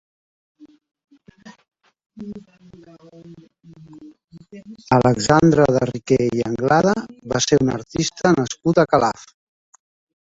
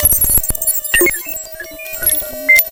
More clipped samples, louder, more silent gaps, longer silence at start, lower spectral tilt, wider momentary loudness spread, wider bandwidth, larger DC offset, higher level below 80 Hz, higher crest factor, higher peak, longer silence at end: neither; second, -18 LUFS vs -12 LUFS; first, 1.68-1.72 s, 2.06-2.10 s, 4.24-4.28 s vs none; first, 0.6 s vs 0 s; first, -5.5 dB/octave vs -1.5 dB/octave; first, 21 LU vs 15 LU; second, 8 kHz vs 17.5 kHz; neither; second, -50 dBFS vs -30 dBFS; about the same, 20 dB vs 16 dB; about the same, 0 dBFS vs 0 dBFS; first, 1.15 s vs 0 s